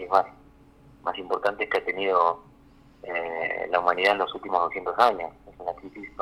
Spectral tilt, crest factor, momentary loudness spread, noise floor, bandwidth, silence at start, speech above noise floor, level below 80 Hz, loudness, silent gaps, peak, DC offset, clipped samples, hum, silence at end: -4 dB/octave; 22 dB; 14 LU; -54 dBFS; 14.5 kHz; 0 s; 29 dB; -60 dBFS; -26 LUFS; none; -4 dBFS; under 0.1%; under 0.1%; none; 0 s